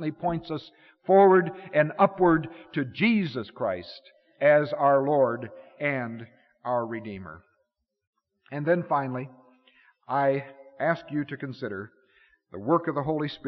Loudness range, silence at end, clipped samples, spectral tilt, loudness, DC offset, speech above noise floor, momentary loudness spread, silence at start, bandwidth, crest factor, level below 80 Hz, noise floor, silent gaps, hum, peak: 8 LU; 0 s; under 0.1%; -5.5 dB/octave; -26 LUFS; under 0.1%; 51 dB; 18 LU; 0 s; 6 kHz; 18 dB; -64 dBFS; -77 dBFS; 8.07-8.13 s; none; -8 dBFS